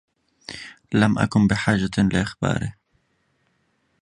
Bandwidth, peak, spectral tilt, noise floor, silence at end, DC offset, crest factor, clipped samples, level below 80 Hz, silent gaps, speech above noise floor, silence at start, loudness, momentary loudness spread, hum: 11 kHz; -2 dBFS; -6 dB/octave; -68 dBFS; 1.3 s; under 0.1%; 20 dB; under 0.1%; -44 dBFS; none; 48 dB; 0.5 s; -21 LUFS; 18 LU; none